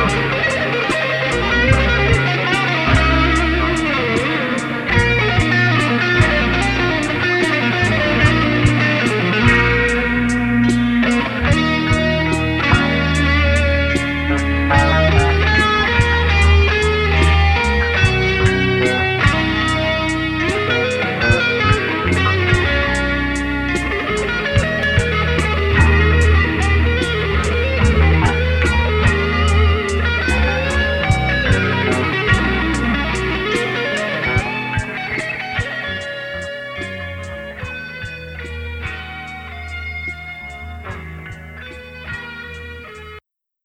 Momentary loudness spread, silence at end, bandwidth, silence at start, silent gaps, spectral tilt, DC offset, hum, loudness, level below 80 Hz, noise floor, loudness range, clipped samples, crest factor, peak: 14 LU; 0.45 s; 11 kHz; 0 s; none; -5.5 dB/octave; under 0.1%; none; -16 LUFS; -24 dBFS; -44 dBFS; 13 LU; under 0.1%; 14 dB; -2 dBFS